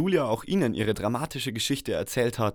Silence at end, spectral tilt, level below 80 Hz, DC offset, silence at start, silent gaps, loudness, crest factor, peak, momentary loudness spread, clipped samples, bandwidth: 0 s; -5 dB/octave; -52 dBFS; under 0.1%; 0 s; none; -27 LUFS; 16 dB; -12 dBFS; 4 LU; under 0.1%; over 20 kHz